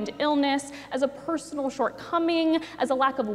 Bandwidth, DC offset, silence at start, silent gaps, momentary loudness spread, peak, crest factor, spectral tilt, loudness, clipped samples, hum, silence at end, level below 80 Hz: 12.5 kHz; under 0.1%; 0 s; none; 7 LU; -10 dBFS; 16 dB; -4 dB/octave; -26 LUFS; under 0.1%; none; 0 s; -64 dBFS